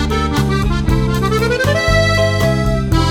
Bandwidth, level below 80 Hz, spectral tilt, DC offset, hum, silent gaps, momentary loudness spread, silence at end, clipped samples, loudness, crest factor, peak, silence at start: 18 kHz; -22 dBFS; -5.5 dB/octave; under 0.1%; none; none; 3 LU; 0 s; under 0.1%; -15 LUFS; 12 dB; 0 dBFS; 0 s